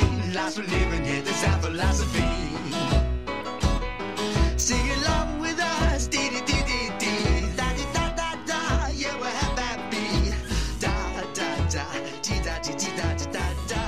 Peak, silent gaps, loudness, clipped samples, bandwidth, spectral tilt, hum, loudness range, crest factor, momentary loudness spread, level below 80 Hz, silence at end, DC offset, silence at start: -8 dBFS; none; -26 LUFS; under 0.1%; 14.5 kHz; -4 dB/octave; none; 3 LU; 18 dB; 5 LU; -30 dBFS; 0 s; 0.6%; 0 s